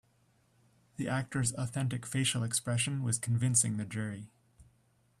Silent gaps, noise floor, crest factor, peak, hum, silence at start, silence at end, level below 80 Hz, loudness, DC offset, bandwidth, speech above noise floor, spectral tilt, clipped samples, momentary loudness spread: none; -70 dBFS; 20 dB; -14 dBFS; none; 1 s; 0.55 s; -66 dBFS; -32 LUFS; under 0.1%; 14 kHz; 37 dB; -4 dB/octave; under 0.1%; 11 LU